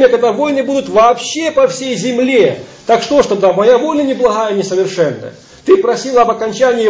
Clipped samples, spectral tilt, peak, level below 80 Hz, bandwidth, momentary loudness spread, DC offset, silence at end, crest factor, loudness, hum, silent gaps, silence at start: under 0.1%; -4.5 dB/octave; 0 dBFS; -50 dBFS; 8 kHz; 6 LU; under 0.1%; 0 s; 12 dB; -12 LUFS; none; none; 0 s